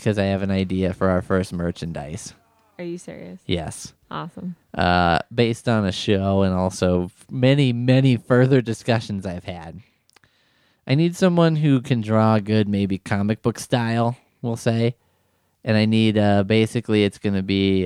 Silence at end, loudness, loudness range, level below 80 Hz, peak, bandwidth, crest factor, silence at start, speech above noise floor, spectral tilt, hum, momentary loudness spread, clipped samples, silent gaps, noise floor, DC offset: 0 s; -21 LUFS; 6 LU; -54 dBFS; -4 dBFS; 13 kHz; 18 dB; 0 s; 46 dB; -6.5 dB/octave; none; 15 LU; under 0.1%; none; -66 dBFS; under 0.1%